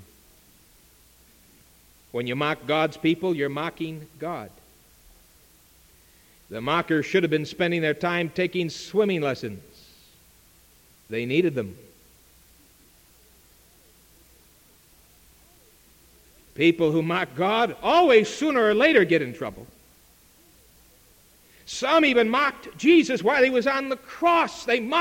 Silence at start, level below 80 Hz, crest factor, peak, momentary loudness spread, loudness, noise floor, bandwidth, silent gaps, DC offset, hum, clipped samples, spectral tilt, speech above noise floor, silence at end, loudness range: 2.15 s; -60 dBFS; 20 dB; -4 dBFS; 16 LU; -23 LUFS; -56 dBFS; 17 kHz; none; under 0.1%; none; under 0.1%; -5.5 dB/octave; 34 dB; 0 s; 10 LU